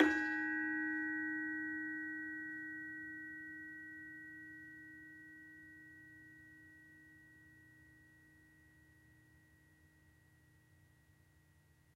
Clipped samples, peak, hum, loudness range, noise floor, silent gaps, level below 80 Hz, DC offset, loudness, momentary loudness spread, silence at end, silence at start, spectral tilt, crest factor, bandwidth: under 0.1%; -14 dBFS; none; 25 LU; -70 dBFS; none; -78 dBFS; under 0.1%; -42 LUFS; 25 LU; 2.1 s; 0 s; -5 dB/octave; 30 dB; 13 kHz